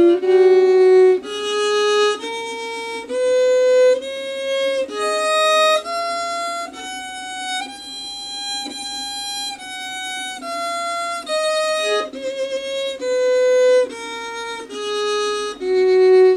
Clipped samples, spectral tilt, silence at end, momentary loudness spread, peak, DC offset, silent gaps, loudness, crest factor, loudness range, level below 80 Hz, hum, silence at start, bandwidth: under 0.1%; -1.5 dB/octave; 0 s; 14 LU; -6 dBFS; under 0.1%; none; -19 LUFS; 14 dB; 8 LU; -62 dBFS; none; 0 s; 12.5 kHz